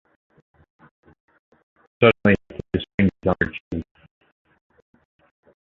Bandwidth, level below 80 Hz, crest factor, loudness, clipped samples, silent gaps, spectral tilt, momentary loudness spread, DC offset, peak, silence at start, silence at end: 4.3 kHz; -44 dBFS; 24 dB; -21 LUFS; under 0.1%; 2.94-2.98 s, 3.60-3.71 s; -8.5 dB/octave; 16 LU; under 0.1%; -2 dBFS; 2 s; 1.8 s